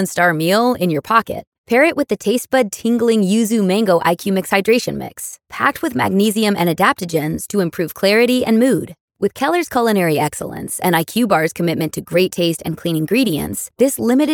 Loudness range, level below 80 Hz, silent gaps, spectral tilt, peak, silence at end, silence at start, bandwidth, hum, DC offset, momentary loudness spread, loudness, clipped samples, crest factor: 2 LU; -54 dBFS; 1.47-1.52 s, 1.58-1.64 s, 9.00-9.08 s; -5 dB/octave; 0 dBFS; 0 s; 0 s; 19 kHz; none; under 0.1%; 8 LU; -16 LUFS; under 0.1%; 16 dB